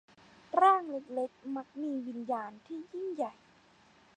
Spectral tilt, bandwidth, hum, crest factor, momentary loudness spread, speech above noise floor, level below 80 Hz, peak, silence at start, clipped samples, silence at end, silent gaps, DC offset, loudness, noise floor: -5 dB/octave; 9.4 kHz; none; 20 dB; 16 LU; 30 dB; -82 dBFS; -14 dBFS; 0.55 s; under 0.1%; 0.85 s; none; under 0.1%; -33 LUFS; -63 dBFS